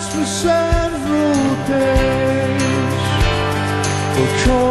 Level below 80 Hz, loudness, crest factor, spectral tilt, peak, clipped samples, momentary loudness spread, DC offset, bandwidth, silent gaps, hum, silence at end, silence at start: -26 dBFS; -17 LUFS; 12 dB; -5 dB/octave; -4 dBFS; under 0.1%; 3 LU; under 0.1%; 12.5 kHz; none; none; 0 s; 0 s